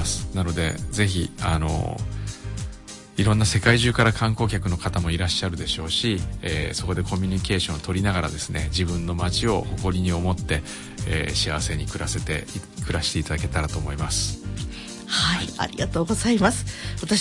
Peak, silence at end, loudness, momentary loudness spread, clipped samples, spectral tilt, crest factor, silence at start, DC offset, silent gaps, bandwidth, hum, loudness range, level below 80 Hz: -4 dBFS; 0 s; -24 LUFS; 11 LU; under 0.1%; -4.5 dB/octave; 18 dB; 0 s; under 0.1%; none; 11.5 kHz; none; 4 LU; -36 dBFS